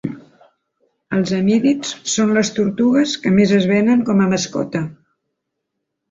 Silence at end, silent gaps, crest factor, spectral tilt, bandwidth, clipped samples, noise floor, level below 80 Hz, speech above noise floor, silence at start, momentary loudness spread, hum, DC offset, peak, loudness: 1.15 s; none; 14 dB; -5 dB/octave; 7.8 kHz; under 0.1%; -77 dBFS; -56 dBFS; 61 dB; 0.05 s; 9 LU; none; under 0.1%; -4 dBFS; -17 LUFS